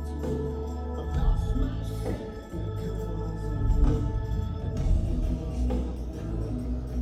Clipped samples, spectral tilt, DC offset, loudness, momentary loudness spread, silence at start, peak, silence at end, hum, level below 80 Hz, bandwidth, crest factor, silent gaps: under 0.1%; -8.5 dB/octave; under 0.1%; -31 LUFS; 7 LU; 0 s; -12 dBFS; 0 s; none; -30 dBFS; 12 kHz; 16 dB; none